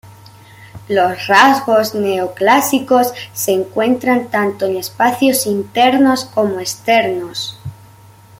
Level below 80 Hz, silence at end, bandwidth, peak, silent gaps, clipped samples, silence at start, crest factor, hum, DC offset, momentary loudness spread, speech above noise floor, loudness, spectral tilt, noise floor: -56 dBFS; 0.65 s; 16.5 kHz; 0 dBFS; none; under 0.1%; 0.05 s; 16 dB; none; under 0.1%; 10 LU; 28 dB; -14 LUFS; -3.5 dB/octave; -42 dBFS